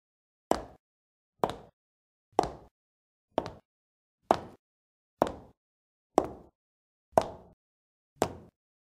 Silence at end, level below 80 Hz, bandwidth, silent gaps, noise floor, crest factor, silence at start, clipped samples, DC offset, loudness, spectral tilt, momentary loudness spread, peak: 0.45 s; -60 dBFS; 15.5 kHz; 0.79-1.33 s, 1.73-2.32 s, 2.71-3.28 s, 3.65-4.18 s, 4.59-5.17 s, 5.57-6.10 s, 6.55-7.12 s, 7.53-8.16 s; under -90 dBFS; 34 dB; 0.5 s; under 0.1%; under 0.1%; -33 LUFS; -5 dB/octave; 22 LU; -2 dBFS